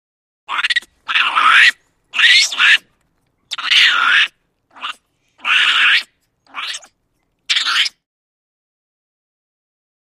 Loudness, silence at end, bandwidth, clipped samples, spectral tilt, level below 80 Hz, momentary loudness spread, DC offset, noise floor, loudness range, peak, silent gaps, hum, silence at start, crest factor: -12 LUFS; 2.3 s; 15.5 kHz; under 0.1%; 4 dB/octave; -70 dBFS; 19 LU; under 0.1%; -67 dBFS; 10 LU; 0 dBFS; none; none; 0.5 s; 18 dB